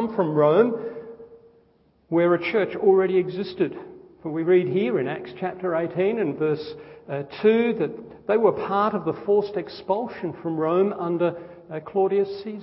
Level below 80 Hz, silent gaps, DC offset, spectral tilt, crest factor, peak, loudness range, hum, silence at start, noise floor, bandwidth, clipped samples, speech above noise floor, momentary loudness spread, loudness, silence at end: -64 dBFS; none; under 0.1%; -11.5 dB/octave; 18 dB; -6 dBFS; 2 LU; none; 0 s; -61 dBFS; 5.8 kHz; under 0.1%; 38 dB; 13 LU; -23 LUFS; 0 s